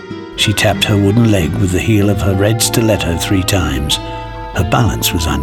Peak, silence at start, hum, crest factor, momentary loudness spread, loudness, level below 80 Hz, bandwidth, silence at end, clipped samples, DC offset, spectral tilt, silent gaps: 0 dBFS; 0 s; none; 14 dB; 6 LU; -13 LUFS; -28 dBFS; 18 kHz; 0 s; under 0.1%; under 0.1%; -4.5 dB/octave; none